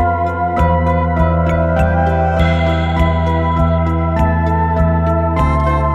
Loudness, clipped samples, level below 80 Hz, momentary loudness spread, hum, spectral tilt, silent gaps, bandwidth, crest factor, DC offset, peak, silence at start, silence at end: -15 LUFS; under 0.1%; -20 dBFS; 1 LU; none; -8.5 dB/octave; none; 7.2 kHz; 12 dB; under 0.1%; -2 dBFS; 0 s; 0 s